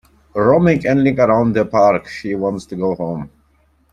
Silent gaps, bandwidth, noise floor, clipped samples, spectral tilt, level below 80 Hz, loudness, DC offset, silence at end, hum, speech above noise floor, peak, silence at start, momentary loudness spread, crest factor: none; 10 kHz; -57 dBFS; under 0.1%; -8 dB/octave; -46 dBFS; -16 LUFS; under 0.1%; 0.65 s; none; 42 dB; -2 dBFS; 0.35 s; 12 LU; 14 dB